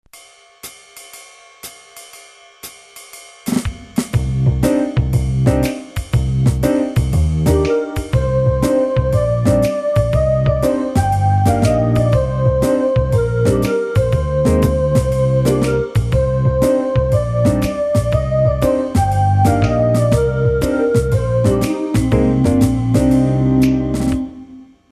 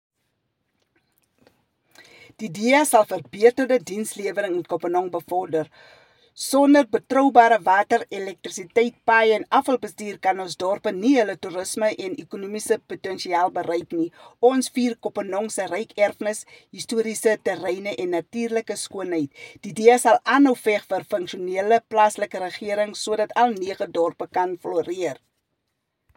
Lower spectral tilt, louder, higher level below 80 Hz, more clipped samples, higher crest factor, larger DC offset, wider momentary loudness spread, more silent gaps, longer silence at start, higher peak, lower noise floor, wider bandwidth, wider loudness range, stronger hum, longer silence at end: first, -7.5 dB/octave vs -3.5 dB/octave; first, -16 LUFS vs -22 LUFS; first, -26 dBFS vs -72 dBFS; neither; second, 14 dB vs 22 dB; neither; second, 11 LU vs 14 LU; neither; second, 0.15 s vs 2.4 s; about the same, 0 dBFS vs 0 dBFS; second, -44 dBFS vs -77 dBFS; second, 13.5 kHz vs 17 kHz; about the same, 5 LU vs 6 LU; neither; second, 0.25 s vs 1.05 s